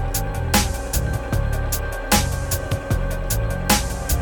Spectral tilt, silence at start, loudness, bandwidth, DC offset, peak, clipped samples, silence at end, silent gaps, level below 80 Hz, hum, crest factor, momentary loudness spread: -4 dB/octave; 0 s; -22 LUFS; 17.5 kHz; under 0.1%; -2 dBFS; under 0.1%; 0 s; none; -26 dBFS; none; 18 dB; 5 LU